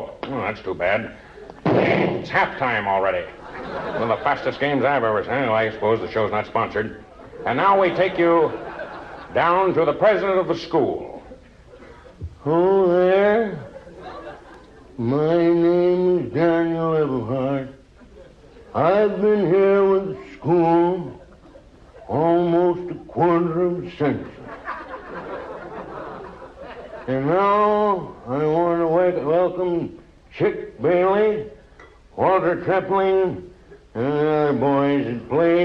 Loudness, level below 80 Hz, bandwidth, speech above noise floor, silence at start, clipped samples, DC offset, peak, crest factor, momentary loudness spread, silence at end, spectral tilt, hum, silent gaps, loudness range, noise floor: -20 LUFS; -50 dBFS; 6.4 kHz; 28 dB; 0 s; under 0.1%; under 0.1%; -4 dBFS; 16 dB; 18 LU; 0 s; -8.5 dB/octave; none; none; 3 LU; -47 dBFS